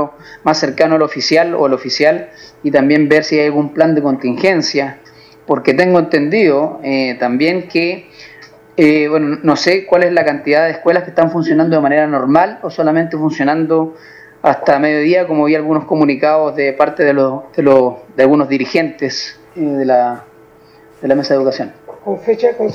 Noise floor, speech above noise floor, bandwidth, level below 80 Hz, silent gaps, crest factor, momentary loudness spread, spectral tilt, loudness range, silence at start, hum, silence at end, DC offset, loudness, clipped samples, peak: -43 dBFS; 30 dB; 7.6 kHz; -58 dBFS; none; 14 dB; 8 LU; -6 dB/octave; 2 LU; 0 s; none; 0 s; under 0.1%; -13 LUFS; under 0.1%; 0 dBFS